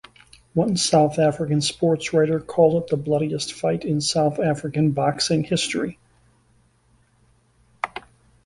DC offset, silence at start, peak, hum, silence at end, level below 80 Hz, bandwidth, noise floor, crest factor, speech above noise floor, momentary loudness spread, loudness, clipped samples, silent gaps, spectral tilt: under 0.1%; 0.55 s; -4 dBFS; none; 0.45 s; -56 dBFS; 11.5 kHz; -61 dBFS; 18 dB; 40 dB; 9 LU; -22 LUFS; under 0.1%; none; -5 dB/octave